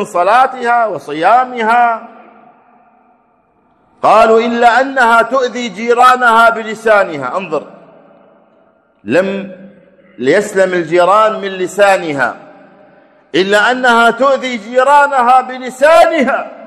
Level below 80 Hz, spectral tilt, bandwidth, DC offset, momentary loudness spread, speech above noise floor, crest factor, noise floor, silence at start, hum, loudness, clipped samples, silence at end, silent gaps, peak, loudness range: -54 dBFS; -4 dB/octave; 14 kHz; under 0.1%; 11 LU; 43 dB; 12 dB; -54 dBFS; 0 s; none; -11 LUFS; 0.5%; 0 s; none; 0 dBFS; 7 LU